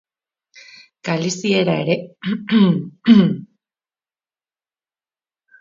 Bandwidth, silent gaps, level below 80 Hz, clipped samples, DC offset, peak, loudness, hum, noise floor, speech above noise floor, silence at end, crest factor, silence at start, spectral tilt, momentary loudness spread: 7.6 kHz; none; -64 dBFS; under 0.1%; under 0.1%; 0 dBFS; -17 LUFS; none; under -90 dBFS; over 74 dB; 2.15 s; 20 dB; 1.05 s; -6 dB/octave; 12 LU